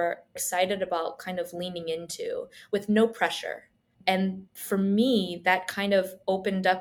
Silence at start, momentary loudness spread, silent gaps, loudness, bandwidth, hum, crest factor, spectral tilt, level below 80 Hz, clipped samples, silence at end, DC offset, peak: 0 s; 10 LU; none; -28 LUFS; 19.5 kHz; none; 18 dB; -4.5 dB/octave; -70 dBFS; under 0.1%; 0 s; under 0.1%; -8 dBFS